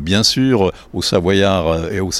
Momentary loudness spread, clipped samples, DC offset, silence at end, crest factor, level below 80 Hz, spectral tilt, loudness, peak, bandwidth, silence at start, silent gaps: 6 LU; under 0.1%; under 0.1%; 0 s; 14 dB; -36 dBFS; -4.5 dB/octave; -15 LUFS; -2 dBFS; 15.5 kHz; 0 s; none